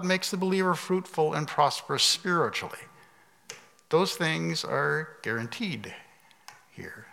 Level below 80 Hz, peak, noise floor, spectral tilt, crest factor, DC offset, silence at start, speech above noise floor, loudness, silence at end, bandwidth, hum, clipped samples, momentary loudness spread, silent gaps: -80 dBFS; -8 dBFS; -59 dBFS; -3.5 dB/octave; 20 dB; under 0.1%; 0 s; 31 dB; -27 LUFS; 0.05 s; 16.5 kHz; none; under 0.1%; 21 LU; none